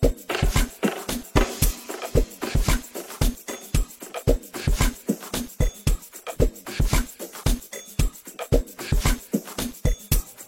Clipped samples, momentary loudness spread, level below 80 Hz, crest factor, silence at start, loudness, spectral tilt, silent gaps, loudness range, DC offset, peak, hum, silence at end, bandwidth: under 0.1%; 7 LU; -26 dBFS; 20 dB; 0 s; -27 LUFS; -4.5 dB/octave; none; 2 LU; under 0.1%; -4 dBFS; none; 0.05 s; 16.5 kHz